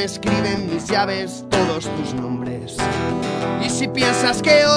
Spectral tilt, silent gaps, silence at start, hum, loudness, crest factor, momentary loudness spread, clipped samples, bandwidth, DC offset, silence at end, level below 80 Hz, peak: -4 dB/octave; none; 0 s; none; -20 LUFS; 18 dB; 8 LU; under 0.1%; 11 kHz; under 0.1%; 0 s; -44 dBFS; -2 dBFS